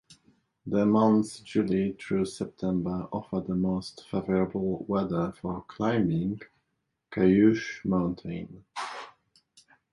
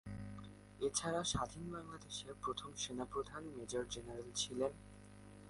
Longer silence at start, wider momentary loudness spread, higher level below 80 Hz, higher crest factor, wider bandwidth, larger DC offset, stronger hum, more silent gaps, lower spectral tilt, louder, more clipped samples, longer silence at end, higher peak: about the same, 0.1 s vs 0.05 s; about the same, 15 LU vs 16 LU; first, -56 dBFS vs -62 dBFS; about the same, 18 dB vs 22 dB; about the same, 11.5 kHz vs 11.5 kHz; neither; second, none vs 50 Hz at -65 dBFS; neither; first, -7.5 dB/octave vs -3.5 dB/octave; first, -28 LUFS vs -43 LUFS; neither; first, 0.85 s vs 0 s; first, -10 dBFS vs -22 dBFS